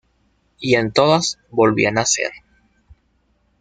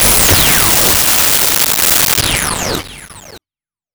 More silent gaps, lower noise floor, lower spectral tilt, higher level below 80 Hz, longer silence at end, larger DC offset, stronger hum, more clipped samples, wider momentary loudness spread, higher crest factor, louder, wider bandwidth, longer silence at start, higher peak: neither; second, -63 dBFS vs under -90 dBFS; first, -3.5 dB/octave vs -1 dB/octave; second, -54 dBFS vs -28 dBFS; first, 1.25 s vs 0.55 s; neither; neither; neither; second, 7 LU vs 11 LU; first, 18 dB vs 12 dB; second, -17 LUFS vs -8 LUFS; second, 9.8 kHz vs over 20 kHz; first, 0.6 s vs 0 s; about the same, -2 dBFS vs 0 dBFS